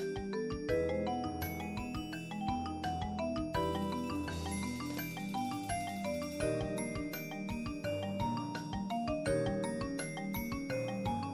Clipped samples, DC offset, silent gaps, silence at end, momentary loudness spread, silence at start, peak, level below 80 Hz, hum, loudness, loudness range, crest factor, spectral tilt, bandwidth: under 0.1%; under 0.1%; none; 0 s; 5 LU; 0 s; -22 dBFS; -52 dBFS; none; -38 LUFS; 1 LU; 16 dB; -5.5 dB/octave; over 20 kHz